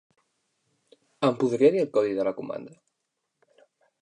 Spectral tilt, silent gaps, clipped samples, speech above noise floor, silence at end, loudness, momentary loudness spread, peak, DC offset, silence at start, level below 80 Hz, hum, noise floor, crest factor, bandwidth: -7 dB/octave; none; under 0.1%; 56 dB; 1.35 s; -25 LUFS; 15 LU; -8 dBFS; under 0.1%; 1.2 s; -76 dBFS; none; -80 dBFS; 20 dB; 9.6 kHz